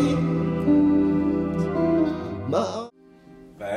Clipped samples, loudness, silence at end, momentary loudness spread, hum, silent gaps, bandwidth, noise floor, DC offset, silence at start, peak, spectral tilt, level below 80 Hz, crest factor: under 0.1%; -23 LUFS; 0 s; 12 LU; none; none; 10 kHz; -50 dBFS; under 0.1%; 0 s; -10 dBFS; -8 dB/octave; -46 dBFS; 14 dB